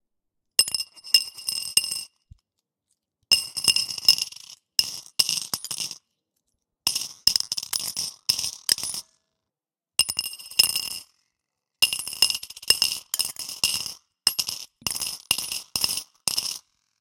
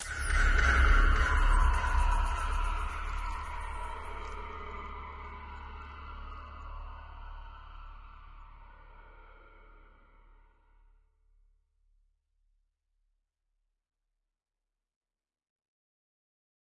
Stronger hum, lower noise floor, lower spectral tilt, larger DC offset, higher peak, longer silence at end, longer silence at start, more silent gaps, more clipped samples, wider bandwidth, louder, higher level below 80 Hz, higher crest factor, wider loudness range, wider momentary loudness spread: neither; about the same, -90 dBFS vs -89 dBFS; second, 1.5 dB/octave vs -4.5 dB/octave; neither; first, -2 dBFS vs -14 dBFS; second, 0.4 s vs 7.3 s; first, 0.6 s vs 0 s; neither; neither; first, 17 kHz vs 11.5 kHz; first, -23 LUFS vs -32 LUFS; second, -62 dBFS vs -34 dBFS; first, 26 dB vs 20 dB; second, 3 LU vs 24 LU; second, 11 LU vs 24 LU